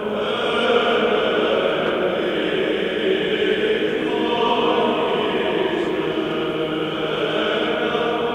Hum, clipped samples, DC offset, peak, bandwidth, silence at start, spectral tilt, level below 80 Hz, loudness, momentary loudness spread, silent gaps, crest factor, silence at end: none; under 0.1%; under 0.1%; -4 dBFS; 11.5 kHz; 0 s; -5.5 dB/octave; -52 dBFS; -20 LUFS; 5 LU; none; 16 dB; 0 s